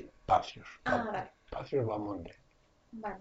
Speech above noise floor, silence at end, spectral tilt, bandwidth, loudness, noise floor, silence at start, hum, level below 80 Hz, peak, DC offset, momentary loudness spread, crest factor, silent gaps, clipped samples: 28 dB; 0 s; -4.5 dB/octave; 8 kHz; -35 LUFS; -62 dBFS; 0 s; none; -58 dBFS; -12 dBFS; under 0.1%; 14 LU; 22 dB; none; under 0.1%